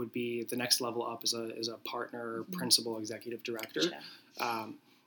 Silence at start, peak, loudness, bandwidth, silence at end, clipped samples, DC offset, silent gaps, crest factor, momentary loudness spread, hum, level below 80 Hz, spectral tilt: 0 s; -8 dBFS; -34 LUFS; 19.5 kHz; 0.3 s; under 0.1%; under 0.1%; none; 28 dB; 13 LU; none; under -90 dBFS; -2 dB/octave